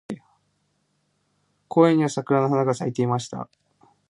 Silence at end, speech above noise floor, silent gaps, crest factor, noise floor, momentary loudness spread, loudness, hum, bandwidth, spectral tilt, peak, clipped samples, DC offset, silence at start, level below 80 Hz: 0.65 s; 49 dB; none; 20 dB; -70 dBFS; 19 LU; -22 LUFS; 50 Hz at -55 dBFS; 11 kHz; -7 dB/octave; -4 dBFS; under 0.1%; under 0.1%; 0.1 s; -68 dBFS